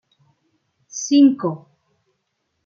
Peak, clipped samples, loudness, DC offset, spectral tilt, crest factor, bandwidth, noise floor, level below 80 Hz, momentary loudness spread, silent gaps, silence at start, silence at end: -4 dBFS; under 0.1%; -17 LUFS; under 0.1%; -5 dB/octave; 18 dB; 7.2 kHz; -73 dBFS; -76 dBFS; 20 LU; none; 0.95 s; 1.1 s